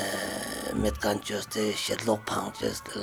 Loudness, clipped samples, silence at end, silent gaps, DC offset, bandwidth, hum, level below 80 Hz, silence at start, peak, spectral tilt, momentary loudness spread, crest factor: -30 LUFS; under 0.1%; 0 s; none; under 0.1%; over 20 kHz; none; -46 dBFS; 0 s; -10 dBFS; -3.5 dB/octave; 4 LU; 20 dB